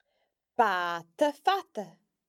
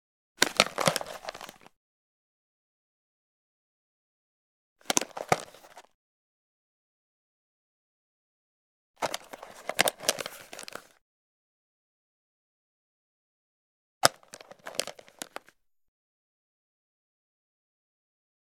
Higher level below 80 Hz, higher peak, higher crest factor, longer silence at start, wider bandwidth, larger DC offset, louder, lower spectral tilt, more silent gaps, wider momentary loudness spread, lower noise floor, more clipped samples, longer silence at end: second, -86 dBFS vs -72 dBFS; second, -10 dBFS vs 0 dBFS; second, 20 dB vs 36 dB; first, 0.6 s vs 0.4 s; second, 15 kHz vs 19.5 kHz; neither; about the same, -29 LUFS vs -29 LUFS; first, -3.5 dB/octave vs -1.5 dB/octave; second, none vs 1.76-4.76 s, 5.94-8.94 s, 11.01-14.01 s; second, 15 LU vs 21 LU; first, -78 dBFS vs -65 dBFS; neither; second, 0.4 s vs 3.6 s